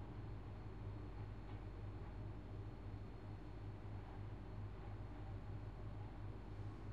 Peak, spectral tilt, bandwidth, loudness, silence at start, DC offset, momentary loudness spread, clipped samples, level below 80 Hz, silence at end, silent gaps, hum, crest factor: -38 dBFS; -8.5 dB/octave; 7.4 kHz; -53 LUFS; 0 s; 0.1%; 1 LU; under 0.1%; -56 dBFS; 0 s; none; none; 12 dB